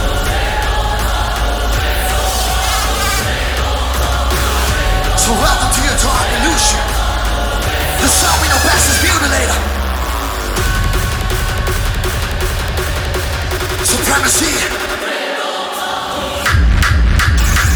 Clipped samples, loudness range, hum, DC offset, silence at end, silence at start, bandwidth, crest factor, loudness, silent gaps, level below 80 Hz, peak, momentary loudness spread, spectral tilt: under 0.1%; 4 LU; none; under 0.1%; 0 s; 0 s; over 20 kHz; 14 dB; -14 LUFS; none; -18 dBFS; 0 dBFS; 7 LU; -3 dB/octave